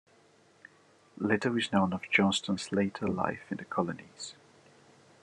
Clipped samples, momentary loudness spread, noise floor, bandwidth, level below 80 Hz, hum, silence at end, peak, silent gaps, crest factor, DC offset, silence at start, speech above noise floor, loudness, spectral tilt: under 0.1%; 15 LU; -63 dBFS; 11 kHz; -72 dBFS; none; 0.9 s; -12 dBFS; none; 22 dB; under 0.1%; 1.15 s; 32 dB; -30 LUFS; -5 dB/octave